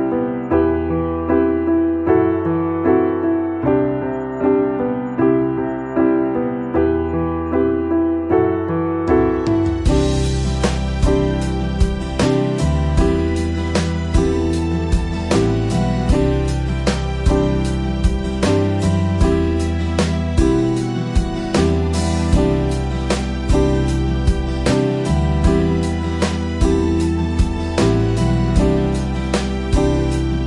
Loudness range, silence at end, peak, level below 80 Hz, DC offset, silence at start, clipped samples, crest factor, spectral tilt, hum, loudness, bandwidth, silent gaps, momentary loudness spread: 1 LU; 0 s; -2 dBFS; -24 dBFS; under 0.1%; 0 s; under 0.1%; 14 dB; -7 dB/octave; none; -18 LUFS; 11.5 kHz; none; 4 LU